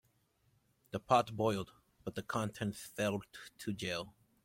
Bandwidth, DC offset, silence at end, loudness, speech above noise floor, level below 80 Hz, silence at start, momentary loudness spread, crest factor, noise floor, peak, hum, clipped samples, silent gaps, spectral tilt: 16.5 kHz; under 0.1%; 0.35 s; -37 LUFS; 38 dB; -68 dBFS; 0.95 s; 16 LU; 24 dB; -75 dBFS; -14 dBFS; none; under 0.1%; none; -5 dB/octave